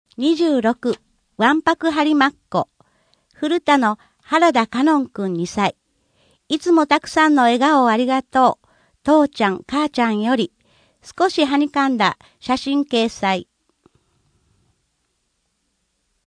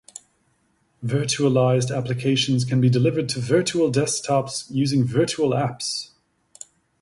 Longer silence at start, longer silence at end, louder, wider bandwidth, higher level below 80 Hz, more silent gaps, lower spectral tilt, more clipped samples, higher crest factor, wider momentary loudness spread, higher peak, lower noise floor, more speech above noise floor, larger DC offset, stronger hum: second, 0.2 s vs 1 s; first, 2.95 s vs 0.95 s; first, -18 LUFS vs -21 LUFS; about the same, 10.5 kHz vs 11.5 kHz; about the same, -58 dBFS vs -58 dBFS; neither; about the same, -4.5 dB/octave vs -5.5 dB/octave; neither; about the same, 18 dB vs 16 dB; second, 9 LU vs 16 LU; first, -2 dBFS vs -6 dBFS; first, -70 dBFS vs -66 dBFS; first, 53 dB vs 45 dB; neither; neither